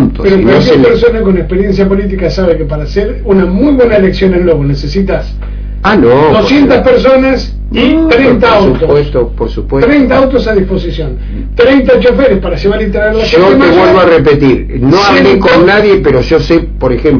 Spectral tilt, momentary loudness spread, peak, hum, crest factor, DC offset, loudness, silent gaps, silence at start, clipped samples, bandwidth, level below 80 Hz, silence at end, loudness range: -7.5 dB/octave; 9 LU; 0 dBFS; none; 6 dB; under 0.1%; -7 LUFS; none; 0 s; 4%; 5.4 kHz; -18 dBFS; 0 s; 4 LU